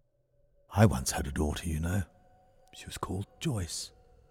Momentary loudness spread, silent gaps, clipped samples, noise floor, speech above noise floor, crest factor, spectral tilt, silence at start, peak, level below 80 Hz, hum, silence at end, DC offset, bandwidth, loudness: 18 LU; none; under 0.1%; -69 dBFS; 38 dB; 22 dB; -5.5 dB/octave; 0.7 s; -10 dBFS; -44 dBFS; none; 0.4 s; under 0.1%; 17 kHz; -32 LUFS